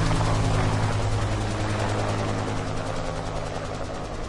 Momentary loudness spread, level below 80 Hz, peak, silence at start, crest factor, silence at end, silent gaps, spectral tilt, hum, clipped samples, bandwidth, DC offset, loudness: 8 LU; -32 dBFS; -10 dBFS; 0 s; 14 dB; 0 s; none; -5.5 dB/octave; none; under 0.1%; 11.5 kHz; under 0.1%; -27 LUFS